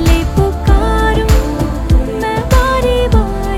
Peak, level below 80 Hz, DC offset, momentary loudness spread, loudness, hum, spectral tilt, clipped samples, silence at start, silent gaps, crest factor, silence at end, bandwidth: 0 dBFS; -14 dBFS; under 0.1%; 5 LU; -13 LUFS; none; -6 dB/octave; under 0.1%; 0 s; none; 10 dB; 0 s; 15 kHz